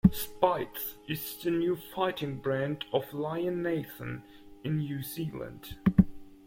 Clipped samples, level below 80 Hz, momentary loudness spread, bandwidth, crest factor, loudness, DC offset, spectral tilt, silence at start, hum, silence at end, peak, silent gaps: under 0.1%; -50 dBFS; 13 LU; 16.5 kHz; 24 dB; -32 LUFS; under 0.1%; -6.5 dB/octave; 0.05 s; none; 0.1 s; -6 dBFS; none